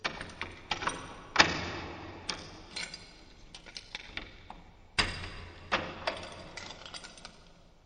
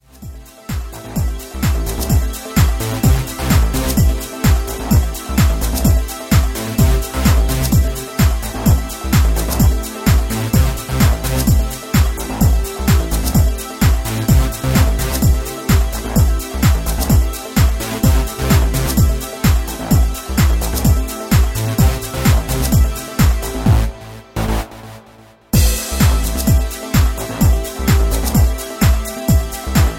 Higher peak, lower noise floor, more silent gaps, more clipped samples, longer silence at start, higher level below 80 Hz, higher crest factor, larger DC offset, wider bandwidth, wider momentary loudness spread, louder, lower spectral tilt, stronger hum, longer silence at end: second, -4 dBFS vs 0 dBFS; first, -57 dBFS vs -44 dBFS; neither; neither; second, 0 s vs 0.2 s; second, -54 dBFS vs -18 dBFS; first, 32 dB vs 14 dB; neither; second, 9.8 kHz vs 17 kHz; first, 21 LU vs 4 LU; second, -34 LUFS vs -16 LUFS; second, -2.5 dB/octave vs -5.5 dB/octave; neither; about the same, 0.05 s vs 0 s